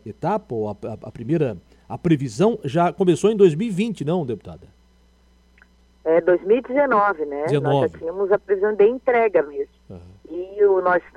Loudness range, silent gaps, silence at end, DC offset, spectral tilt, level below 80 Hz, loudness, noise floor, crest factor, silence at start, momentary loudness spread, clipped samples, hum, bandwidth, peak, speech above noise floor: 3 LU; none; 0.15 s; under 0.1%; -7 dB/octave; -54 dBFS; -20 LUFS; -56 dBFS; 18 dB; 0.05 s; 15 LU; under 0.1%; none; 11 kHz; -2 dBFS; 36 dB